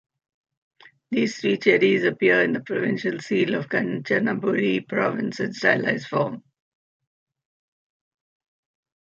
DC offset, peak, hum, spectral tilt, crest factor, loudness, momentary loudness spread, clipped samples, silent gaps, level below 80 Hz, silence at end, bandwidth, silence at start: under 0.1%; -4 dBFS; none; -6 dB/octave; 20 dB; -22 LUFS; 8 LU; under 0.1%; none; -70 dBFS; 2.65 s; 7.6 kHz; 1.1 s